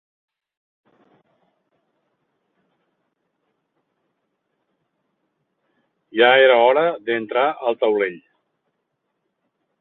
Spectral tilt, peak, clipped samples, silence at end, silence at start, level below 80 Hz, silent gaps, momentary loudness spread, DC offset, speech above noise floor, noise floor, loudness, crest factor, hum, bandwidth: -7.5 dB/octave; -2 dBFS; under 0.1%; 1.65 s; 6.15 s; -76 dBFS; none; 12 LU; under 0.1%; 58 dB; -75 dBFS; -17 LUFS; 22 dB; none; 4.1 kHz